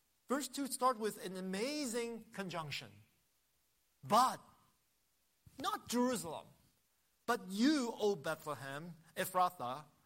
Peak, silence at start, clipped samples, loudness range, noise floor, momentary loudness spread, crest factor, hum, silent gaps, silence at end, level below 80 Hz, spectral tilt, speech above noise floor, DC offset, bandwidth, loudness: -18 dBFS; 0.3 s; under 0.1%; 3 LU; -79 dBFS; 14 LU; 20 dB; none; none; 0.2 s; -80 dBFS; -4 dB/octave; 41 dB; under 0.1%; 16 kHz; -38 LUFS